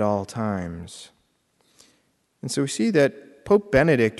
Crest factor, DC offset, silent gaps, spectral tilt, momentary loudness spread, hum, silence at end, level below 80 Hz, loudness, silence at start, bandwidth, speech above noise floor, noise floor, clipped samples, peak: 18 dB; under 0.1%; none; -5.5 dB/octave; 20 LU; none; 0 s; -50 dBFS; -22 LUFS; 0 s; 12 kHz; 45 dB; -67 dBFS; under 0.1%; -6 dBFS